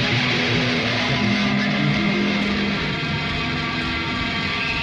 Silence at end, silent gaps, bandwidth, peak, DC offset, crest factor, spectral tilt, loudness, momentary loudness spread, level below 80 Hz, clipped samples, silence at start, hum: 0 s; none; 9.8 kHz; -8 dBFS; under 0.1%; 14 dB; -5 dB/octave; -20 LUFS; 4 LU; -40 dBFS; under 0.1%; 0 s; none